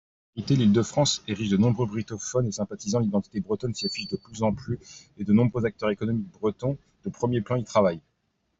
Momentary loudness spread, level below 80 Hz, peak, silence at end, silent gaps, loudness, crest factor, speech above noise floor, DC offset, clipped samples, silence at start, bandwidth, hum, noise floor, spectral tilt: 12 LU; -56 dBFS; -8 dBFS; 0.6 s; none; -26 LUFS; 18 dB; 48 dB; under 0.1%; under 0.1%; 0.35 s; 8 kHz; none; -74 dBFS; -6 dB/octave